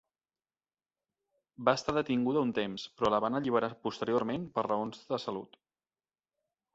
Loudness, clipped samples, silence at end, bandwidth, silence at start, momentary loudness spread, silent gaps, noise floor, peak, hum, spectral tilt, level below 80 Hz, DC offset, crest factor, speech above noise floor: -32 LUFS; under 0.1%; 1.3 s; 8 kHz; 1.6 s; 7 LU; none; under -90 dBFS; -12 dBFS; none; -6 dB/octave; -68 dBFS; under 0.1%; 22 dB; over 58 dB